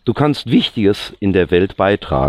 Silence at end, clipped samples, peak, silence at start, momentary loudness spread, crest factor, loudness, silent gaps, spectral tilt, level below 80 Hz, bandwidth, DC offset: 0 s; under 0.1%; -2 dBFS; 0.05 s; 3 LU; 14 dB; -15 LUFS; none; -7 dB/octave; -36 dBFS; 14 kHz; under 0.1%